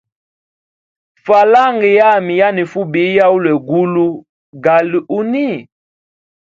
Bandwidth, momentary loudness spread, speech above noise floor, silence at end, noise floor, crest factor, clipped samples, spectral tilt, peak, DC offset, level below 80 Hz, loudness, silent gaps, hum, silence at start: 7.6 kHz; 9 LU; over 78 dB; 0.85 s; under -90 dBFS; 14 dB; under 0.1%; -7.5 dB/octave; 0 dBFS; under 0.1%; -62 dBFS; -12 LUFS; 4.29-4.53 s; none; 1.25 s